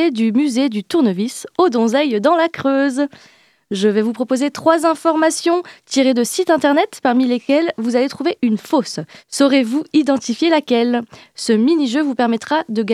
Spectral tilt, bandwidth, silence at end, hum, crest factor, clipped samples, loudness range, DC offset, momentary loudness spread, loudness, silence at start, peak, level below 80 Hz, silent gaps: -4.5 dB/octave; 14.5 kHz; 0 s; none; 16 dB; under 0.1%; 1 LU; under 0.1%; 6 LU; -16 LUFS; 0 s; 0 dBFS; -68 dBFS; none